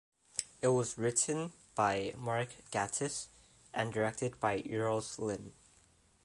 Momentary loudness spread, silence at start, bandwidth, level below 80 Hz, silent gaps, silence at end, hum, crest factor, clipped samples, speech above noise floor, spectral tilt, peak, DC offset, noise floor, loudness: 9 LU; 0.35 s; 11.5 kHz; -68 dBFS; none; 0.75 s; none; 26 dB; under 0.1%; 32 dB; -4 dB/octave; -10 dBFS; under 0.1%; -67 dBFS; -36 LUFS